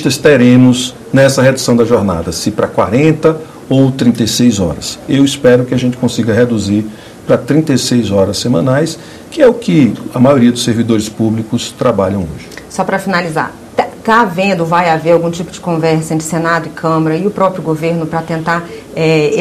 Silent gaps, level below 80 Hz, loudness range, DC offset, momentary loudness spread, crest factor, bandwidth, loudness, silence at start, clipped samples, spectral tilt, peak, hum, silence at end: none; -42 dBFS; 3 LU; under 0.1%; 9 LU; 12 dB; 14.5 kHz; -12 LUFS; 0 s; 1%; -5.5 dB/octave; 0 dBFS; none; 0 s